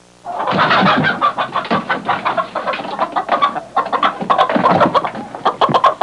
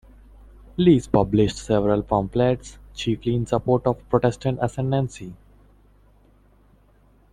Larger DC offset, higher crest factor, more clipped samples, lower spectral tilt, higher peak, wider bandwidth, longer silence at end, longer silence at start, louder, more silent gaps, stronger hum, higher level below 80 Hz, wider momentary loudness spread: neither; second, 14 dB vs 20 dB; neither; second, -5.5 dB/octave vs -7.5 dB/octave; about the same, -2 dBFS vs -4 dBFS; about the same, 11 kHz vs 11 kHz; second, 0 s vs 2 s; second, 0.25 s vs 0.8 s; first, -16 LUFS vs -22 LUFS; neither; second, none vs 50 Hz at -45 dBFS; second, -58 dBFS vs -44 dBFS; second, 8 LU vs 11 LU